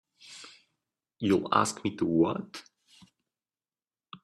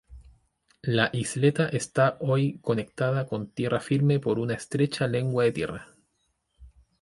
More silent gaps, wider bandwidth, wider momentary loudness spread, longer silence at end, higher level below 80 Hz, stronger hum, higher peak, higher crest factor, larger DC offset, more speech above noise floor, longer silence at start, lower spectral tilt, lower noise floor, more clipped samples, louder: neither; first, 13.5 kHz vs 11.5 kHz; first, 22 LU vs 7 LU; second, 0.1 s vs 0.35 s; second, -70 dBFS vs -58 dBFS; neither; about the same, -8 dBFS vs -6 dBFS; about the same, 24 dB vs 20 dB; neither; first, over 63 dB vs 49 dB; first, 0.25 s vs 0.1 s; about the same, -5 dB/octave vs -6 dB/octave; first, under -90 dBFS vs -74 dBFS; neither; about the same, -28 LUFS vs -26 LUFS